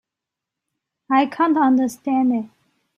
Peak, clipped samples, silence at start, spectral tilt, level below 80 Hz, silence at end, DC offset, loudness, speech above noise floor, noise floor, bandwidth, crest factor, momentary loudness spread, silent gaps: -6 dBFS; under 0.1%; 1.1 s; -5 dB/octave; -70 dBFS; 0.5 s; under 0.1%; -19 LUFS; 67 dB; -85 dBFS; 12.5 kHz; 16 dB; 7 LU; none